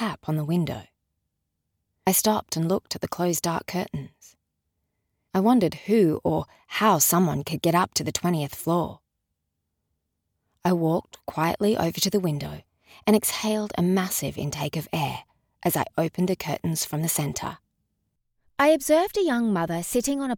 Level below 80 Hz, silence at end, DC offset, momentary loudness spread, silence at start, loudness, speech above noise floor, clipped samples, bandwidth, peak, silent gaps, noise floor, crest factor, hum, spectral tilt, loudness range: -56 dBFS; 0 s; under 0.1%; 10 LU; 0 s; -24 LUFS; 55 dB; under 0.1%; over 20 kHz; -8 dBFS; none; -80 dBFS; 18 dB; none; -4.5 dB/octave; 5 LU